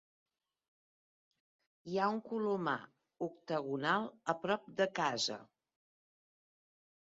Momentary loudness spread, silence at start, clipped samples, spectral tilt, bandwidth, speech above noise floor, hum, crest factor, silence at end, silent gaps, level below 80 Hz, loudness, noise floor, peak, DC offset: 10 LU; 1.85 s; under 0.1%; -3 dB/octave; 7.4 kHz; over 53 dB; none; 22 dB; 1.7 s; none; -82 dBFS; -37 LUFS; under -90 dBFS; -18 dBFS; under 0.1%